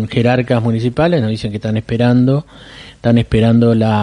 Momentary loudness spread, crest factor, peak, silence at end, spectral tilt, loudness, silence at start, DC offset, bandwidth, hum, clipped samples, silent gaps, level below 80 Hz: 8 LU; 14 dB; 0 dBFS; 0 s; -8.5 dB/octave; -14 LUFS; 0 s; under 0.1%; 10 kHz; none; under 0.1%; none; -38 dBFS